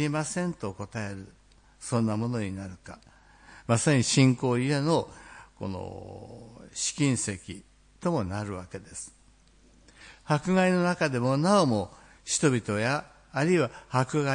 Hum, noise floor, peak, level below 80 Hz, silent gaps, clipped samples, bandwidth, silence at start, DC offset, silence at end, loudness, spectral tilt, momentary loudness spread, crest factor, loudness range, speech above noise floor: none; -59 dBFS; -8 dBFS; -60 dBFS; none; under 0.1%; 10.5 kHz; 0 s; under 0.1%; 0 s; -27 LUFS; -5 dB/octave; 21 LU; 20 dB; 7 LU; 32 dB